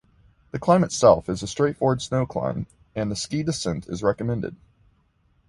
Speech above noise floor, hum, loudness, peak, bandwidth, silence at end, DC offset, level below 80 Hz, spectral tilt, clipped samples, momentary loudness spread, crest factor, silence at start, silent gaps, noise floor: 41 dB; none; -23 LUFS; -2 dBFS; 11.5 kHz; 0.95 s; under 0.1%; -50 dBFS; -5.5 dB/octave; under 0.1%; 12 LU; 22 dB; 0.55 s; none; -64 dBFS